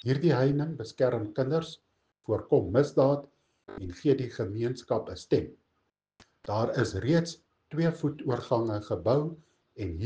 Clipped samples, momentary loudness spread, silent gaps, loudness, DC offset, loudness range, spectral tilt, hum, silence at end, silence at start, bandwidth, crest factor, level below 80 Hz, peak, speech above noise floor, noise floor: under 0.1%; 15 LU; none; -29 LUFS; under 0.1%; 3 LU; -7.5 dB/octave; none; 0 s; 0.05 s; 9.2 kHz; 18 dB; -58 dBFS; -10 dBFS; 50 dB; -78 dBFS